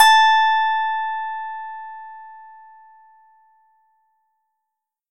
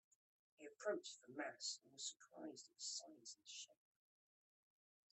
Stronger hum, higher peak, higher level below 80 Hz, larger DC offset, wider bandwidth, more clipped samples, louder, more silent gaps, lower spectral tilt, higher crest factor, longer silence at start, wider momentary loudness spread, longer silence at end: neither; first, 0 dBFS vs -32 dBFS; first, -84 dBFS vs under -90 dBFS; neither; first, 16.5 kHz vs 8.4 kHz; neither; first, -18 LUFS vs -51 LUFS; neither; second, 4 dB/octave vs -1 dB/octave; about the same, 20 dB vs 22 dB; second, 0 s vs 0.6 s; first, 25 LU vs 11 LU; first, 2.6 s vs 1.4 s